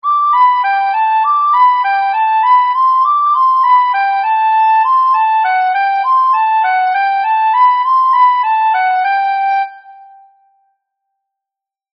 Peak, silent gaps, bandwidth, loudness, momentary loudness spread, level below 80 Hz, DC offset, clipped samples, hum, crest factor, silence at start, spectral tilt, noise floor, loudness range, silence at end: -2 dBFS; none; 5.6 kHz; -11 LUFS; 4 LU; under -90 dBFS; under 0.1%; under 0.1%; none; 10 dB; 0.05 s; 8 dB/octave; -85 dBFS; 4 LU; 2.05 s